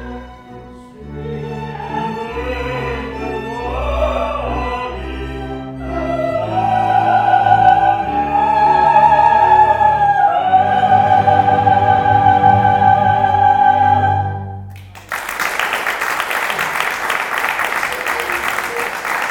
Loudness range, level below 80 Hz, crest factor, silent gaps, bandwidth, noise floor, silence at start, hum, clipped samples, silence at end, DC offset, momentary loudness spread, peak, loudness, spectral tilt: 10 LU; -34 dBFS; 14 dB; none; 18.5 kHz; -35 dBFS; 0 s; none; under 0.1%; 0 s; under 0.1%; 15 LU; 0 dBFS; -14 LUFS; -5 dB/octave